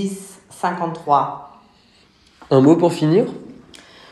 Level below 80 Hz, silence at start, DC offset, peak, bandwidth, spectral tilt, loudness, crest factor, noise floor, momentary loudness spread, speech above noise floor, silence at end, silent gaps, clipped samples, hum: -62 dBFS; 0 s; under 0.1%; 0 dBFS; 12.5 kHz; -7 dB/octave; -18 LUFS; 18 dB; -54 dBFS; 21 LU; 37 dB; 0.6 s; none; under 0.1%; none